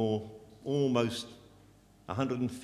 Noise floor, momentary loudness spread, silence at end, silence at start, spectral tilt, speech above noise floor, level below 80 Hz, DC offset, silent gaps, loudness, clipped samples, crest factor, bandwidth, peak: -60 dBFS; 16 LU; 0 s; 0 s; -6.5 dB/octave; 28 dB; -62 dBFS; under 0.1%; none; -33 LUFS; under 0.1%; 20 dB; 14 kHz; -14 dBFS